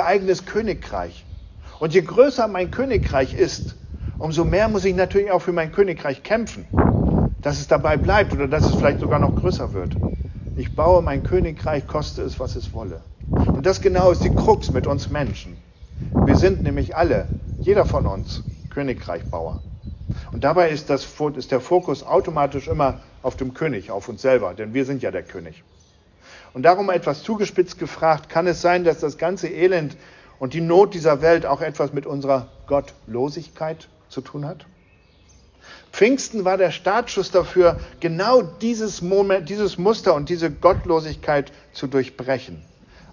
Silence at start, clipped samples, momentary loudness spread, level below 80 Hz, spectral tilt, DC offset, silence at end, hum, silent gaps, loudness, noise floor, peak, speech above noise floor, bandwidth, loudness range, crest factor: 0 s; under 0.1%; 14 LU; -32 dBFS; -6.5 dB/octave; under 0.1%; 0.5 s; none; none; -20 LUFS; -54 dBFS; -2 dBFS; 34 dB; 7.4 kHz; 5 LU; 20 dB